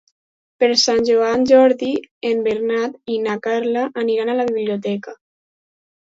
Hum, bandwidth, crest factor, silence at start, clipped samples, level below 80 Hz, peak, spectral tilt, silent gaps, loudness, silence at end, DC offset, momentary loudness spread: none; 7.8 kHz; 18 dB; 0.6 s; under 0.1%; -60 dBFS; -2 dBFS; -3.5 dB/octave; 2.11-2.21 s; -18 LUFS; 1 s; under 0.1%; 11 LU